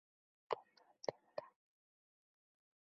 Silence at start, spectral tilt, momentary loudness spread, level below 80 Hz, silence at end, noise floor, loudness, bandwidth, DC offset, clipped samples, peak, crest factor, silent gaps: 0.5 s; -2 dB/octave; 6 LU; under -90 dBFS; 1.45 s; -66 dBFS; -49 LUFS; 6.2 kHz; under 0.1%; under 0.1%; -22 dBFS; 32 dB; none